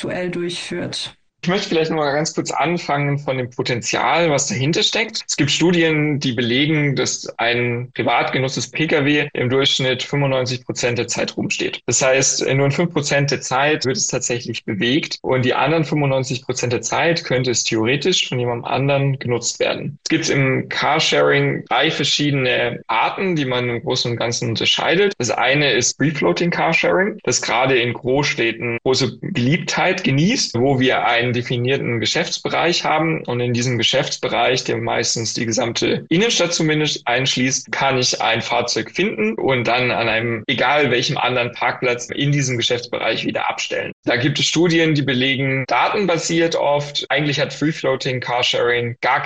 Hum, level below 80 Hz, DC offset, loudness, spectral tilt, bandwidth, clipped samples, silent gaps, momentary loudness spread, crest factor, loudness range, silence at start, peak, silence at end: none; -54 dBFS; under 0.1%; -18 LUFS; -4 dB/octave; 9.4 kHz; under 0.1%; 43.93-44.03 s; 6 LU; 14 dB; 2 LU; 0 s; -4 dBFS; 0 s